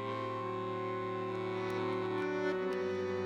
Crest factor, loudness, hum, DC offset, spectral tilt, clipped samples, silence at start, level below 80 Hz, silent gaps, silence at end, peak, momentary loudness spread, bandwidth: 12 dB; -37 LUFS; none; under 0.1%; -7 dB/octave; under 0.1%; 0 s; -74 dBFS; none; 0 s; -24 dBFS; 3 LU; 9.2 kHz